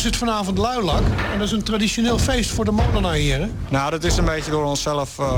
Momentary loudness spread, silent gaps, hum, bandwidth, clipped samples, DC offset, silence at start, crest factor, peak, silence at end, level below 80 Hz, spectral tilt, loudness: 3 LU; none; none; 17.5 kHz; under 0.1%; 0.2%; 0 s; 12 dB; -8 dBFS; 0 s; -28 dBFS; -5 dB/octave; -21 LUFS